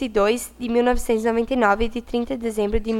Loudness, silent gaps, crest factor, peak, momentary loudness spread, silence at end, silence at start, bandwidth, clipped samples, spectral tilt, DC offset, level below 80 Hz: -22 LUFS; none; 16 dB; -4 dBFS; 6 LU; 0 s; 0 s; 16 kHz; under 0.1%; -5 dB/octave; under 0.1%; -34 dBFS